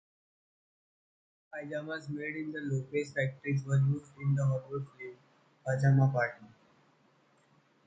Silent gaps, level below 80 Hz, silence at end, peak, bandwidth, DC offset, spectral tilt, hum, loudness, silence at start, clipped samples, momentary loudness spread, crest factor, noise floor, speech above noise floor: none; -72 dBFS; 1.4 s; -16 dBFS; 7.8 kHz; under 0.1%; -8 dB/octave; none; -32 LUFS; 1.55 s; under 0.1%; 18 LU; 18 dB; -68 dBFS; 36 dB